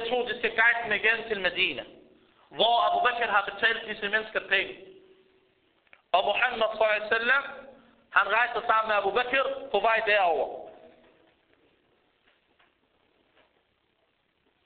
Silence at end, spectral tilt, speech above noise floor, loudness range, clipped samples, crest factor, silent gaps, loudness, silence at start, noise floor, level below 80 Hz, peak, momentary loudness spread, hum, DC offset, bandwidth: 3.9 s; 1.5 dB/octave; 46 dB; 4 LU; under 0.1%; 20 dB; none; -25 LUFS; 0 s; -72 dBFS; -64 dBFS; -10 dBFS; 8 LU; none; under 0.1%; 4.7 kHz